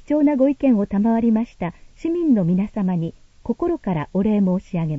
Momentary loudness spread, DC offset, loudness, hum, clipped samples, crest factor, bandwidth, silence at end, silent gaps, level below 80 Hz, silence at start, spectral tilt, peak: 12 LU; under 0.1%; -20 LUFS; none; under 0.1%; 14 dB; 7.4 kHz; 0 s; none; -46 dBFS; 0.1 s; -10 dB/octave; -6 dBFS